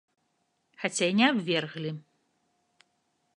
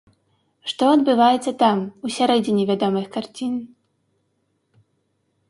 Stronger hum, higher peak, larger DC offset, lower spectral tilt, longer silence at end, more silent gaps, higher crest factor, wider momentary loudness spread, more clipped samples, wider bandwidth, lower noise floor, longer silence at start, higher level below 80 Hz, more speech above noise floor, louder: neither; second, -8 dBFS vs -4 dBFS; neither; second, -4 dB/octave vs -5.5 dB/octave; second, 1.35 s vs 1.85 s; neither; first, 24 dB vs 18 dB; about the same, 14 LU vs 13 LU; neither; about the same, 11 kHz vs 11.5 kHz; first, -76 dBFS vs -70 dBFS; first, 0.8 s vs 0.65 s; second, -82 dBFS vs -68 dBFS; about the same, 48 dB vs 51 dB; second, -27 LUFS vs -20 LUFS